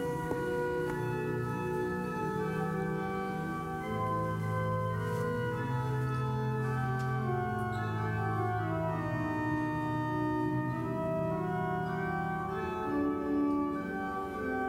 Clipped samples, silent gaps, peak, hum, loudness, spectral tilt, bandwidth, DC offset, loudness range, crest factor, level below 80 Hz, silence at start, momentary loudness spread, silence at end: under 0.1%; none; -20 dBFS; none; -34 LUFS; -8 dB/octave; 16 kHz; under 0.1%; 1 LU; 12 dB; -54 dBFS; 0 s; 3 LU; 0 s